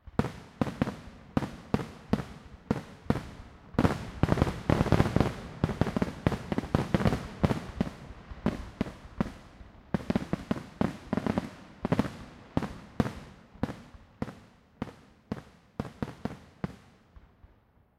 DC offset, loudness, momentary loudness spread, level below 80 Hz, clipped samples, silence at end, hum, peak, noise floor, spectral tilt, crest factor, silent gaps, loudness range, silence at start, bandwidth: under 0.1%; -33 LUFS; 15 LU; -46 dBFS; under 0.1%; 1.2 s; none; -6 dBFS; -63 dBFS; -7.5 dB/octave; 26 dB; none; 12 LU; 0.05 s; 15 kHz